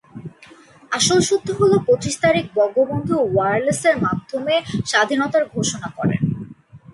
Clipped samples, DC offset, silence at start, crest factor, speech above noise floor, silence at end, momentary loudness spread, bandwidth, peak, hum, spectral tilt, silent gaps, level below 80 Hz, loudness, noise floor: under 0.1%; under 0.1%; 0.15 s; 16 dB; 28 dB; 0.15 s; 8 LU; 11.5 kHz; -2 dBFS; none; -4.5 dB/octave; none; -50 dBFS; -19 LUFS; -46 dBFS